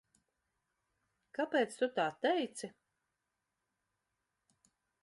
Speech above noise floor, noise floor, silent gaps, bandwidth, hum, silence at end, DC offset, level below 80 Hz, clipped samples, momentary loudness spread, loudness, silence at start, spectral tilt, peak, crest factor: 52 dB; -87 dBFS; none; 11.5 kHz; none; 2.35 s; under 0.1%; -88 dBFS; under 0.1%; 14 LU; -35 LUFS; 1.4 s; -3.5 dB/octave; -18 dBFS; 22 dB